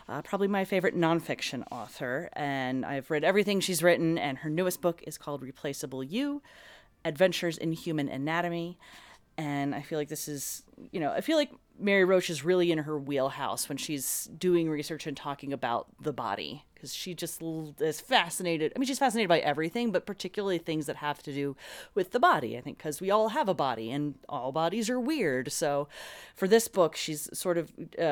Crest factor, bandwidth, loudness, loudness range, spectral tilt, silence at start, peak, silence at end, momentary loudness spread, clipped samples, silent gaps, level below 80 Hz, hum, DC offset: 22 dB; over 20 kHz; -30 LUFS; 5 LU; -4.5 dB/octave; 0.1 s; -8 dBFS; 0 s; 12 LU; under 0.1%; none; -68 dBFS; none; under 0.1%